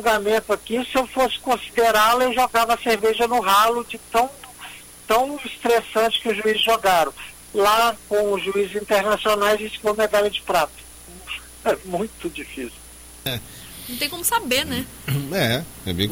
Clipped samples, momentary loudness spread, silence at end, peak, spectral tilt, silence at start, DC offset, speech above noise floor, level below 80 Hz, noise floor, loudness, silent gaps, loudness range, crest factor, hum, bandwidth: under 0.1%; 16 LU; 0 s; -6 dBFS; -3.5 dB/octave; 0 s; under 0.1%; 19 dB; -48 dBFS; -40 dBFS; -21 LUFS; none; 7 LU; 14 dB; none; 17 kHz